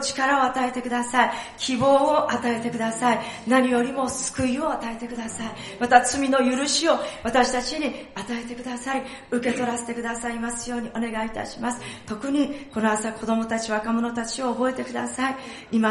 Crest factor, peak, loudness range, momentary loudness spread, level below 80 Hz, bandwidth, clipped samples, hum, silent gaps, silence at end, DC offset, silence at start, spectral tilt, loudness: 22 dB; -2 dBFS; 6 LU; 12 LU; -54 dBFS; 11.5 kHz; under 0.1%; none; none; 0 s; under 0.1%; 0 s; -3 dB/octave; -24 LUFS